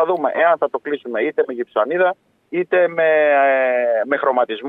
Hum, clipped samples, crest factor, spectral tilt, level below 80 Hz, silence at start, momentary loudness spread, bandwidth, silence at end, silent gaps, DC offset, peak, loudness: none; under 0.1%; 14 dB; -7.5 dB/octave; -78 dBFS; 0 s; 9 LU; 4 kHz; 0 s; none; under 0.1%; -4 dBFS; -18 LUFS